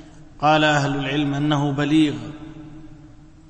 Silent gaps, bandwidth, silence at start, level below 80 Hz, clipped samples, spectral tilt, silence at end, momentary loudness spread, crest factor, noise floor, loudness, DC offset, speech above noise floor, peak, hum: none; 8.6 kHz; 0 s; -46 dBFS; under 0.1%; -6 dB/octave; 0.35 s; 22 LU; 16 dB; -44 dBFS; -20 LUFS; under 0.1%; 25 dB; -6 dBFS; none